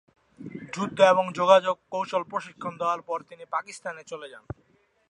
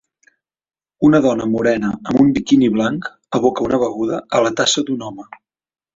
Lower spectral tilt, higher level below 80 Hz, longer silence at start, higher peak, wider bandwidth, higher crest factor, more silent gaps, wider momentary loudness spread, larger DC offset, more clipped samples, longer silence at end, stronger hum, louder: about the same, -4.5 dB/octave vs -5 dB/octave; second, -62 dBFS vs -50 dBFS; second, 0.4 s vs 1 s; about the same, -4 dBFS vs -2 dBFS; first, 11 kHz vs 7.8 kHz; first, 22 dB vs 16 dB; neither; first, 22 LU vs 10 LU; neither; neither; about the same, 0.7 s vs 0.7 s; neither; second, -25 LUFS vs -17 LUFS